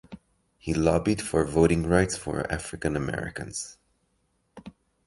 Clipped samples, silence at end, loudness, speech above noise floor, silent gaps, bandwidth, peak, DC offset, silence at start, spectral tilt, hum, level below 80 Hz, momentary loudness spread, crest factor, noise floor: under 0.1%; 0.35 s; -26 LUFS; 46 dB; none; 11.5 kHz; -6 dBFS; under 0.1%; 0.1 s; -5.5 dB/octave; none; -42 dBFS; 12 LU; 22 dB; -72 dBFS